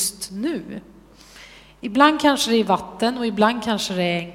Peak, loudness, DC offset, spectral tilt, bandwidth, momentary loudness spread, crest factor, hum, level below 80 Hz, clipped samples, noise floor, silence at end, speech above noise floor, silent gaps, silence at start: 0 dBFS; -20 LUFS; under 0.1%; -3.5 dB/octave; 16.5 kHz; 14 LU; 22 dB; none; -54 dBFS; under 0.1%; -46 dBFS; 0 s; 25 dB; none; 0 s